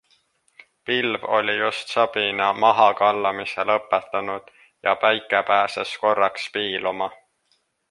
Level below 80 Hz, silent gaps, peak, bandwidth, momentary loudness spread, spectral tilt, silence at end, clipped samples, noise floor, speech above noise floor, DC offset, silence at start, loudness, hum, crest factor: -68 dBFS; none; -2 dBFS; 11.5 kHz; 10 LU; -3.5 dB/octave; 0.75 s; under 0.1%; -68 dBFS; 46 dB; under 0.1%; 0.85 s; -21 LUFS; none; 20 dB